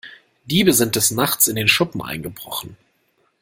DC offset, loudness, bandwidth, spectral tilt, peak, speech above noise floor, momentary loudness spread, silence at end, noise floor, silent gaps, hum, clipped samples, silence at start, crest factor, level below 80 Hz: under 0.1%; -17 LUFS; 16.5 kHz; -3 dB/octave; 0 dBFS; 45 dB; 14 LU; 0.65 s; -65 dBFS; none; none; under 0.1%; 0.05 s; 20 dB; -52 dBFS